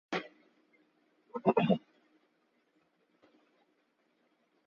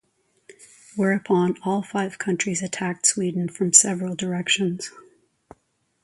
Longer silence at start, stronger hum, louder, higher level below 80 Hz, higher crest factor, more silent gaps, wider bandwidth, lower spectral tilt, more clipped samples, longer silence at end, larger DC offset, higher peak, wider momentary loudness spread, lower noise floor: second, 0.1 s vs 0.5 s; neither; second, -32 LUFS vs -21 LUFS; second, -80 dBFS vs -68 dBFS; about the same, 26 dB vs 24 dB; neither; second, 7.2 kHz vs 11.5 kHz; first, -5.5 dB/octave vs -3 dB/octave; neither; first, 2.9 s vs 1.05 s; neither; second, -12 dBFS vs 0 dBFS; first, 17 LU vs 12 LU; first, -75 dBFS vs -68 dBFS